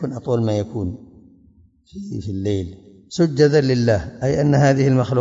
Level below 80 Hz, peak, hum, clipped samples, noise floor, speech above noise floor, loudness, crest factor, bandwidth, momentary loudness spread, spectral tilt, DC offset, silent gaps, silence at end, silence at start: -48 dBFS; -2 dBFS; none; under 0.1%; -53 dBFS; 34 dB; -19 LUFS; 18 dB; 7.8 kHz; 16 LU; -7 dB/octave; under 0.1%; none; 0 s; 0 s